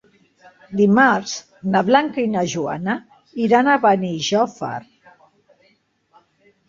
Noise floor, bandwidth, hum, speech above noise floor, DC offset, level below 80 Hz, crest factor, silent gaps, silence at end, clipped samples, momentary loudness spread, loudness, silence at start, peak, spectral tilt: -61 dBFS; 7.4 kHz; none; 44 dB; under 0.1%; -62 dBFS; 20 dB; none; 1.9 s; under 0.1%; 15 LU; -18 LUFS; 0.7 s; 0 dBFS; -5 dB/octave